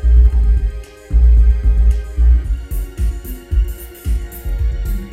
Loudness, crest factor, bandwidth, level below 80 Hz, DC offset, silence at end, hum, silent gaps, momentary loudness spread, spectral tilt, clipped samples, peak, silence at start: -17 LUFS; 12 dB; 15 kHz; -14 dBFS; under 0.1%; 0 s; none; none; 13 LU; -7.5 dB/octave; under 0.1%; -2 dBFS; 0 s